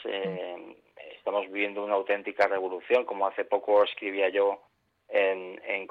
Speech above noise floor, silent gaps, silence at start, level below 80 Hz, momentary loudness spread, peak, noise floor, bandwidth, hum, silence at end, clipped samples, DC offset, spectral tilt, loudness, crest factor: 22 dB; none; 0 s; -78 dBFS; 12 LU; -10 dBFS; -49 dBFS; 5.8 kHz; none; 0.05 s; under 0.1%; under 0.1%; -5.5 dB/octave; -28 LUFS; 18 dB